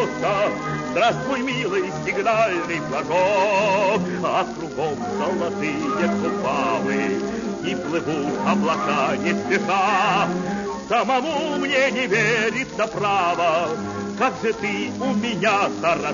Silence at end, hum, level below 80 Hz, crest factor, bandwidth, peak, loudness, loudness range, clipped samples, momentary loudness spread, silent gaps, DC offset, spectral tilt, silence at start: 0 s; none; -56 dBFS; 16 dB; 7.4 kHz; -6 dBFS; -21 LUFS; 3 LU; under 0.1%; 7 LU; none; under 0.1%; -5 dB/octave; 0 s